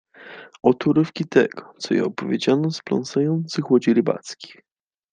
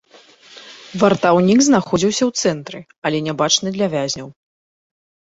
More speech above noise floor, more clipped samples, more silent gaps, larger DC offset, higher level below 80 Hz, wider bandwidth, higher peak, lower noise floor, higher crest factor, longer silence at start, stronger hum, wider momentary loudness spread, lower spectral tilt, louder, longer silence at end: second, 22 dB vs 31 dB; neither; second, none vs 2.98-3.02 s; neither; second, -66 dBFS vs -54 dBFS; first, 9.4 kHz vs 8 kHz; about the same, -2 dBFS vs -2 dBFS; second, -42 dBFS vs -47 dBFS; about the same, 20 dB vs 18 dB; second, 0.2 s vs 0.55 s; neither; about the same, 19 LU vs 19 LU; first, -6.5 dB/octave vs -4 dB/octave; second, -21 LUFS vs -17 LUFS; second, 0.65 s vs 0.95 s